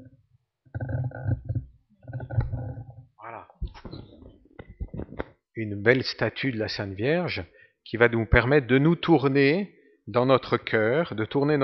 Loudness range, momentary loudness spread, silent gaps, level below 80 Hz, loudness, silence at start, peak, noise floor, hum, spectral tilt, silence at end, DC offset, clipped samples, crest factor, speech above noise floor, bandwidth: 14 LU; 21 LU; none; -42 dBFS; -25 LUFS; 0 s; -2 dBFS; -66 dBFS; none; -5 dB/octave; 0 s; under 0.1%; under 0.1%; 24 dB; 43 dB; 6.2 kHz